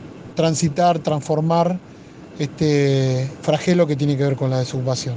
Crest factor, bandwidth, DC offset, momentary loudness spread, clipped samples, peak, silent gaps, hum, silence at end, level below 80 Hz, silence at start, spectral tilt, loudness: 16 dB; 9.8 kHz; under 0.1%; 8 LU; under 0.1%; -4 dBFS; none; none; 0 s; -56 dBFS; 0 s; -6 dB/octave; -20 LUFS